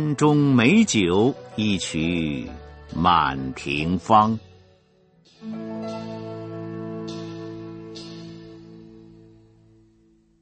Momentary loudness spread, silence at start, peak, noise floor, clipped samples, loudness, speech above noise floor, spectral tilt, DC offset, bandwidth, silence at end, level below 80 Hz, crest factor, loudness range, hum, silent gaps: 21 LU; 0 s; -2 dBFS; -59 dBFS; under 0.1%; -22 LUFS; 39 dB; -5.5 dB/octave; under 0.1%; 8.8 kHz; 1.4 s; -50 dBFS; 22 dB; 16 LU; none; none